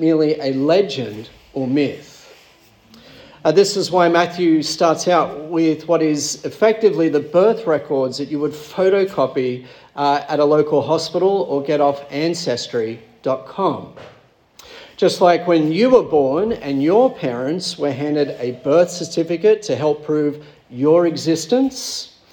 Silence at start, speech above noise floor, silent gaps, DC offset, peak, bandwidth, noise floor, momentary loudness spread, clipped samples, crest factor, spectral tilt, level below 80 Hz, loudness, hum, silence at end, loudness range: 0 s; 33 dB; none; under 0.1%; -2 dBFS; 18 kHz; -50 dBFS; 9 LU; under 0.1%; 16 dB; -5 dB/octave; -60 dBFS; -18 LUFS; none; 0.25 s; 4 LU